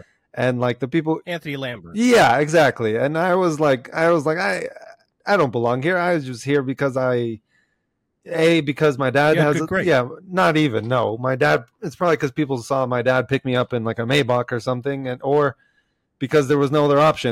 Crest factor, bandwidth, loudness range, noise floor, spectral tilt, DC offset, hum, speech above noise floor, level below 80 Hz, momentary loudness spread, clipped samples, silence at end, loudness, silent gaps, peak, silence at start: 14 dB; 16 kHz; 3 LU; -73 dBFS; -6 dB/octave; under 0.1%; none; 54 dB; -58 dBFS; 9 LU; under 0.1%; 0 s; -19 LUFS; none; -6 dBFS; 0.35 s